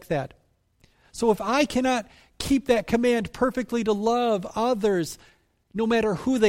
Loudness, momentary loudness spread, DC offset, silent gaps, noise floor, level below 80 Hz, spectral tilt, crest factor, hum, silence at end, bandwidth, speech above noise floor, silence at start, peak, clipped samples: -24 LUFS; 11 LU; under 0.1%; none; -62 dBFS; -50 dBFS; -5 dB/octave; 16 dB; none; 0 s; 16 kHz; 39 dB; 0.1 s; -8 dBFS; under 0.1%